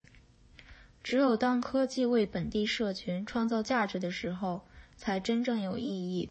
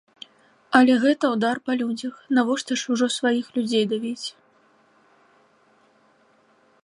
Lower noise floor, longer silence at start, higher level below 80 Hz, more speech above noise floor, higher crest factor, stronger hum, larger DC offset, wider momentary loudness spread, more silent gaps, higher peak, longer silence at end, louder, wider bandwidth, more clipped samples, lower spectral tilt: about the same, -59 dBFS vs -60 dBFS; about the same, 0.6 s vs 0.7 s; first, -60 dBFS vs -76 dBFS; second, 28 dB vs 39 dB; second, 14 dB vs 24 dB; neither; neither; second, 8 LU vs 15 LU; neither; second, -18 dBFS vs -2 dBFS; second, 0 s vs 2.55 s; second, -31 LUFS vs -22 LUFS; second, 8.6 kHz vs 11 kHz; neither; first, -5.5 dB/octave vs -4 dB/octave